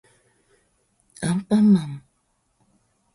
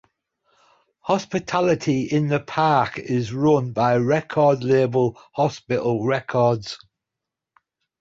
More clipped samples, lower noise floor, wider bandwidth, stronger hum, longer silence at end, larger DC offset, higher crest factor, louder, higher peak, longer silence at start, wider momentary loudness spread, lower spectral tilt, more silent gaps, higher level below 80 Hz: neither; second, -69 dBFS vs -85 dBFS; first, 11.5 kHz vs 7.8 kHz; neither; about the same, 1.15 s vs 1.25 s; neither; about the same, 16 dB vs 16 dB; about the same, -20 LUFS vs -21 LUFS; about the same, -8 dBFS vs -6 dBFS; first, 1.2 s vs 1.05 s; first, 19 LU vs 6 LU; about the same, -7 dB/octave vs -7 dB/octave; neither; about the same, -60 dBFS vs -58 dBFS